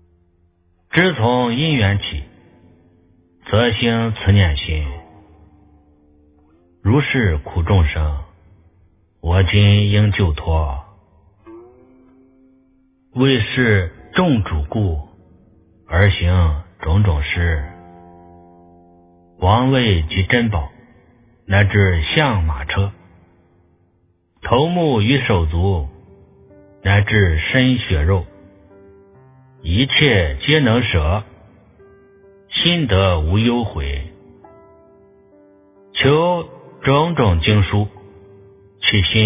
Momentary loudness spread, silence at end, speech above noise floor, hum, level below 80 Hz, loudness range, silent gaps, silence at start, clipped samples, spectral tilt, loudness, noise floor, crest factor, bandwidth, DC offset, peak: 11 LU; 0 s; 45 dB; none; -28 dBFS; 4 LU; none; 0.95 s; under 0.1%; -10 dB/octave; -17 LUFS; -60 dBFS; 18 dB; 3.8 kHz; under 0.1%; 0 dBFS